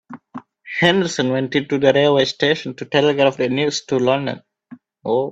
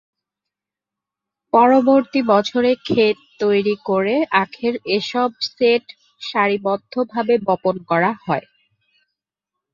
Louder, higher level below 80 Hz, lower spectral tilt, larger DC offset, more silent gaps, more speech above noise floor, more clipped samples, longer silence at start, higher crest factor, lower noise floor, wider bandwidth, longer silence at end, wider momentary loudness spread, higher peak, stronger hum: about the same, -18 LUFS vs -18 LUFS; about the same, -60 dBFS vs -64 dBFS; about the same, -5 dB/octave vs -6 dB/octave; neither; neither; second, 27 dB vs 69 dB; neither; second, 0.1 s vs 1.55 s; about the same, 18 dB vs 18 dB; second, -44 dBFS vs -87 dBFS; first, 8.4 kHz vs 7.4 kHz; second, 0 s vs 1.35 s; first, 18 LU vs 8 LU; about the same, 0 dBFS vs -2 dBFS; neither